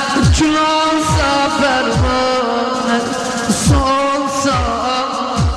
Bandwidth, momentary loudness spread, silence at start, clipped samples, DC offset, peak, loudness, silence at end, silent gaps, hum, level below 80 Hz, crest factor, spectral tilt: 14 kHz; 4 LU; 0 s; under 0.1%; under 0.1%; -2 dBFS; -15 LUFS; 0 s; none; none; -26 dBFS; 12 dB; -4.5 dB/octave